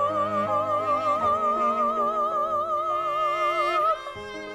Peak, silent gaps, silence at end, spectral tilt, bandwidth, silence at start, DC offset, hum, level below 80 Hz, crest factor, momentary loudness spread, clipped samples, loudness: -14 dBFS; none; 0 s; -5 dB/octave; 13 kHz; 0 s; under 0.1%; none; -58 dBFS; 12 dB; 3 LU; under 0.1%; -24 LUFS